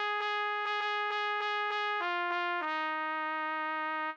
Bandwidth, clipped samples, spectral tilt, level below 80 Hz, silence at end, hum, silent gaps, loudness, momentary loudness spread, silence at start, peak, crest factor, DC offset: 8 kHz; under 0.1%; 0 dB/octave; under -90 dBFS; 0 s; none; none; -32 LUFS; 2 LU; 0 s; -22 dBFS; 12 dB; under 0.1%